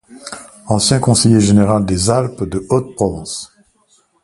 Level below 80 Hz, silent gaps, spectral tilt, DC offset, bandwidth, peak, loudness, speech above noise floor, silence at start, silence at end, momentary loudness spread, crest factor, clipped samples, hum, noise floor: -38 dBFS; none; -5 dB/octave; under 0.1%; 11.5 kHz; 0 dBFS; -14 LUFS; 43 dB; 0.1 s; 0.8 s; 20 LU; 16 dB; under 0.1%; none; -56 dBFS